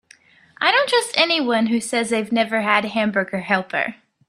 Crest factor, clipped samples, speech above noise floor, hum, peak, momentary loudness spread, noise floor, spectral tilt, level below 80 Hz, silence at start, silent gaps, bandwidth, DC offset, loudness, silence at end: 20 dB; under 0.1%; 32 dB; none; -2 dBFS; 5 LU; -52 dBFS; -3.5 dB/octave; -66 dBFS; 0.6 s; none; 14.5 kHz; under 0.1%; -19 LUFS; 0.35 s